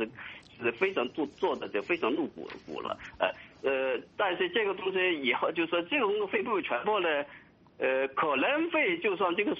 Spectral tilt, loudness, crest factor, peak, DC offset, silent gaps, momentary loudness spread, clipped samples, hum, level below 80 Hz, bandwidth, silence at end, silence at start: -1.5 dB/octave; -30 LUFS; 18 dB; -12 dBFS; under 0.1%; none; 10 LU; under 0.1%; none; -70 dBFS; 7.2 kHz; 0 s; 0 s